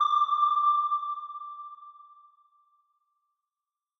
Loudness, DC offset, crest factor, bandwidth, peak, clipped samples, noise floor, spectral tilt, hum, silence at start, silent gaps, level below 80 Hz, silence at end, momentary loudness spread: -26 LUFS; under 0.1%; 16 dB; 6.2 kHz; -16 dBFS; under 0.1%; under -90 dBFS; 1 dB/octave; none; 0 s; none; under -90 dBFS; 1.95 s; 20 LU